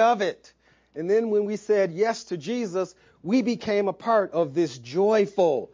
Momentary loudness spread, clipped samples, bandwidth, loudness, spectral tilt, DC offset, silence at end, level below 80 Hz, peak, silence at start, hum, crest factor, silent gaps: 9 LU; under 0.1%; 7.6 kHz; -25 LUFS; -6 dB/octave; under 0.1%; 0.1 s; -68 dBFS; -8 dBFS; 0 s; none; 16 dB; none